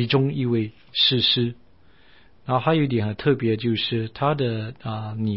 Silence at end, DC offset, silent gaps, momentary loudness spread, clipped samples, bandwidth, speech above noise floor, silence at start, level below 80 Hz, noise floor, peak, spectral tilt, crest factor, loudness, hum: 0 s; 0.3%; none; 11 LU; under 0.1%; 5.8 kHz; 33 dB; 0 s; -56 dBFS; -56 dBFS; -6 dBFS; -10.5 dB/octave; 16 dB; -22 LUFS; none